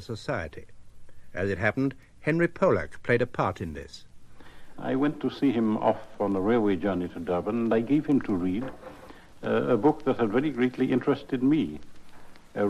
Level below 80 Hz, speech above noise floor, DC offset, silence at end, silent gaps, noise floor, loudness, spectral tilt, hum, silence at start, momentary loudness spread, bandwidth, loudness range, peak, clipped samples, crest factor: -54 dBFS; 21 dB; under 0.1%; 0 s; none; -47 dBFS; -27 LUFS; -8 dB/octave; none; 0 s; 13 LU; 11 kHz; 2 LU; -8 dBFS; under 0.1%; 18 dB